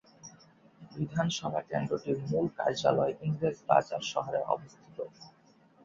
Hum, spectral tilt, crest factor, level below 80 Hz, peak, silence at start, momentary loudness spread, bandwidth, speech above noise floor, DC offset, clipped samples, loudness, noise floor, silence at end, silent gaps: none; -5.5 dB/octave; 24 dB; -66 dBFS; -8 dBFS; 0.25 s; 17 LU; 7.8 kHz; 32 dB; under 0.1%; under 0.1%; -31 LUFS; -62 dBFS; 0.55 s; none